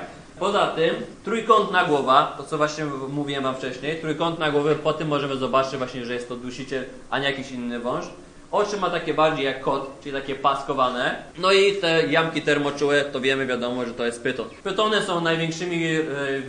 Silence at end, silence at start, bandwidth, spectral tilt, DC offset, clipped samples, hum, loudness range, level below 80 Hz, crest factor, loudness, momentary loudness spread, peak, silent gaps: 0 s; 0 s; 10.5 kHz; -4.5 dB/octave; under 0.1%; under 0.1%; none; 5 LU; -54 dBFS; 22 dB; -23 LUFS; 11 LU; -2 dBFS; none